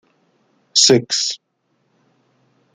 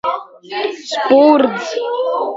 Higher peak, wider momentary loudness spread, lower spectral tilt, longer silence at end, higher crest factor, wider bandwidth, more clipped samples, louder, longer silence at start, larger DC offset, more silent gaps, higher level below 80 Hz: about the same, 0 dBFS vs 0 dBFS; about the same, 12 LU vs 13 LU; second, -2.5 dB/octave vs -4 dB/octave; first, 1.4 s vs 0 s; first, 20 dB vs 14 dB; first, 11.5 kHz vs 7.8 kHz; neither; about the same, -14 LUFS vs -15 LUFS; first, 0.75 s vs 0.05 s; neither; neither; about the same, -64 dBFS vs -64 dBFS